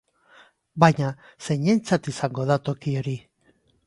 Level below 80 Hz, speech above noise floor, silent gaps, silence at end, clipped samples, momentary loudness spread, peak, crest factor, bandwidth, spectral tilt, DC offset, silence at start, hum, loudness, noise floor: -60 dBFS; 41 dB; none; 0.7 s; under 0.1%; 14 LU; 0 dBFS; 24 dB; 11.5 kHz; -6.5 dB/octave; under 0.1%; 0.75 s; none; -23 LUFS; -64 dBFS